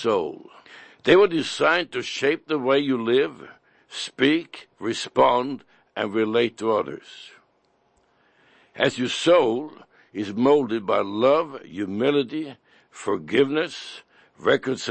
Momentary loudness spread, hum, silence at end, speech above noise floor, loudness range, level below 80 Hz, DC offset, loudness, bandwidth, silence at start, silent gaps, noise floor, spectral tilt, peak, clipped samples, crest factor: 18 LU; none; 0 s; 43 dB; 4 LU; -68 dBFS; under 0.1%; -23 LUFS; 8.8 kHz; 0 s; none; -65 dBFS; -4.5 dB/octave; -4 dBFS; under 0.1%; 20 dB